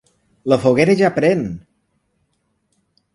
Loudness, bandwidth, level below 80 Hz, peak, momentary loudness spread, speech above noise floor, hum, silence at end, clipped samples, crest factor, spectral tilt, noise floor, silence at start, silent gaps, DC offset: -16 LUFS; 11.5 kHz; -52 dBFS; 0 dBFS; 15 LU; 52 dB; none; 1.55 s; under 0.1%; 20 dB; -7 dB/octave; -67 dBFS; 0.45 s; none; under 0.1%